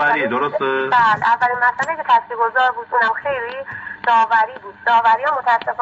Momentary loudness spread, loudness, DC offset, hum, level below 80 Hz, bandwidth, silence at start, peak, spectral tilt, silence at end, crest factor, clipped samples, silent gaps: 9 LU; -17 LUFS; under 0.1%; none; -62 dBFS; 8 kHz; 0 s; -4 dBFS; -0.5 dB/octave; 0 s; 14 dB; under 0.1%; none